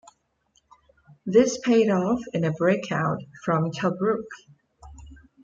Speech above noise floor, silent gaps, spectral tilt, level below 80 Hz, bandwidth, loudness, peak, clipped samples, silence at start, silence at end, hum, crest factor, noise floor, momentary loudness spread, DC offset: 45 dB; none; -6 dB/octave; -56 dBFS; 7.8 kHz; -24 LUFS; -6 dBFS; under 0.1%; 1.25 s; 0.3 s; none; 20 dB; -68 dBFS; 10 LU; under 0.1%